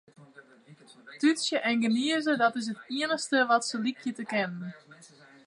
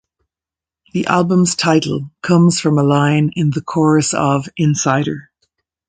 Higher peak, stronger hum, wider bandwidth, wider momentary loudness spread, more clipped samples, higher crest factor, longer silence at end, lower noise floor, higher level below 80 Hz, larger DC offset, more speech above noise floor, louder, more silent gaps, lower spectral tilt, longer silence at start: second, -10 dBFS vs 0 dBFS; neither; first, 11.5 kHz vs 9.4 kHz; about the same, 10 LU vs 9 LU; neither; about the same, 20 dB vs 16 dB; second, 0.4 s vs 0.65 s; second, -55 dBFS vs -89 dBFS; second, -84 dBFS vs -52 dBFS; neither; second, 27 dB vs 74 dB; second, -28 LUFS vs -15 LUFS; neither; second, -3.5 dB/octave vs -5.5 dB/octave; second, 0.2 s vs 0.95 s